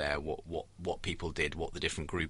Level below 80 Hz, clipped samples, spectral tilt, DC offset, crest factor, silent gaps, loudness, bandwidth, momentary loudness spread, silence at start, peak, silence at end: -48 dBFS; under 0.1%; -4.5 dB/octave; under 0.1%; 20 dB; none; -37 LUFS; 11.5 kHz; 5 LU; 0 s; -16 dBFS; 0 s